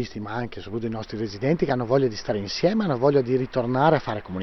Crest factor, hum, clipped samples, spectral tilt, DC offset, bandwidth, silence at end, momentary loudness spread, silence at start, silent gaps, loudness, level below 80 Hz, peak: 18 dB; none; under 0.1%; -7 dB/octave; under 0.1%; 6.4 kHz; 0 s; 11 LU; 0 s; none; -24 LUFS; -50 dBFS; -6 dBFS